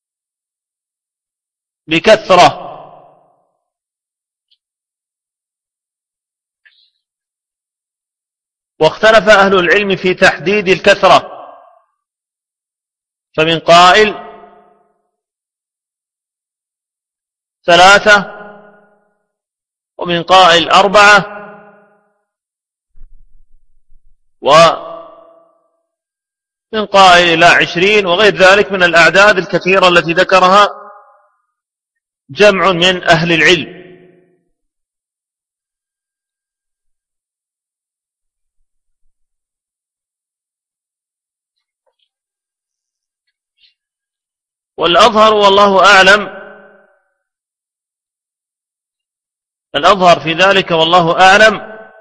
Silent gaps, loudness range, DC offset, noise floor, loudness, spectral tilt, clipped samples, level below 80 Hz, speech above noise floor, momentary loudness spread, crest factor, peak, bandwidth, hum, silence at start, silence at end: none; 7 LU; under 0.1%; -86 dBFS; -8 LUFS; -3.5 dB/octave; 0.6%; -46 dBFS; 78 dB; 12 LU; 14 dB; 0 dBFS; 11 kHz; none; 1.9 s; 0.25 s